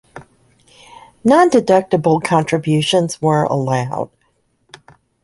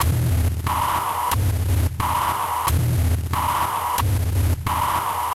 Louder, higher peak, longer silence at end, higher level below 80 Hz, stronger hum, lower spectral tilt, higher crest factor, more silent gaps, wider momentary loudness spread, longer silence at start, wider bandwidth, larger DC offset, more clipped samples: first, -15 LUFS vs -22 LUFS; first, -2 dBFS vs -8 dBFS; first, 1.15 s vs 0 s; second, -54 dBFS vs -28 dBFS; neither; about the same, -6 dB/octave vs -5 dB/octave; about the same, 16 dB vs 12 dB; neither; first, 9 LU vs 2 LU; first, 0.15 s vs 0 s; second, 11.5 kHz vs 16.5 kHz; neither; neither